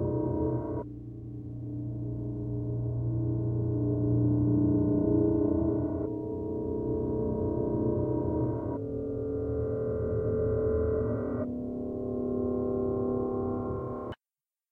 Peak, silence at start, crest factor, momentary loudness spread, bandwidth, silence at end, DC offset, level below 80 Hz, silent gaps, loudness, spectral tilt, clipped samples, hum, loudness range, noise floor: -16 dBFS; 0 s; 14 dB; 10 LU; 3.2 kHz; 0.55 s; under 0.1%; -46 dBFS; none; -31 LUFS; -13 dB/octave; under 0.1%; none; 5 LU; under -90 dBFS